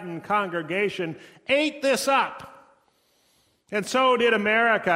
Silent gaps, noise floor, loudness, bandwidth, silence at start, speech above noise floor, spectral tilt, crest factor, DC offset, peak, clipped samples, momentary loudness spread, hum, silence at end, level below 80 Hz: none; -65 dBFS; -23 LUFS; 16 kHz; 0 s; 42 dB; -3.5 dB/octave; 16 dB; under 0.1%; -8 dBFS; under 0.1%; 12 LU; none; 0 s; -68 dBFS